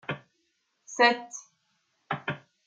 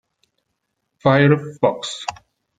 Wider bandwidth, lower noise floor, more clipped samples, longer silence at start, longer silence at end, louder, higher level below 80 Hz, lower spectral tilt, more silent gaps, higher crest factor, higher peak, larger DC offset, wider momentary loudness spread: about the same, 9.2 kHz vs 9.2 kHz; about the same, -75 dBFS vs -75 dBFS; neither; second, 0.1 s vs 1.05 s; second, 0.3 s vs 0.45 s; second, -27 LUFS vs -18 LUFS; second, -76 dBFS vs -58 dBFS; second, -3 dB/octave vs -6 dB/octave; neither; about the same, 24 dB vs 20 dB; second, -6 dBFS vs -2 dBFS; neither; first, 19 LU vs 14 LU